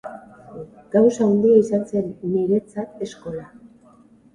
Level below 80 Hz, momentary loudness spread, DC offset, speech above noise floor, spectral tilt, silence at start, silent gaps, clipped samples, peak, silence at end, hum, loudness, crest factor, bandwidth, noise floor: -60 dBFS; 23 LU; under 0.1%; 32 dB; -8 dB/octave; 0.05 s; none; under 0.1%; -4 dBFS; 0.9 s; none; -19 LUFS; 18 dB; 10 kHz; -51 dBFS